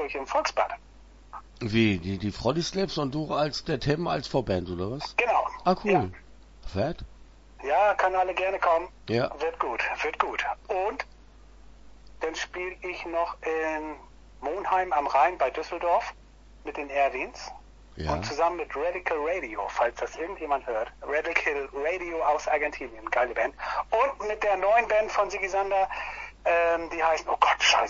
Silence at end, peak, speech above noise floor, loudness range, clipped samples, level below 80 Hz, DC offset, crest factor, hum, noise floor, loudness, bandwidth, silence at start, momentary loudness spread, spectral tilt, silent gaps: 0 s; -6 dBFS; 24 dB; 5 LU; under 0.1%; -50 dBFS; under 0.1%; 22 dB; none; -51 dBFS; -27 LUFS; 8 kHz; 0 s; 11 LU; -4.5 dB/octave; none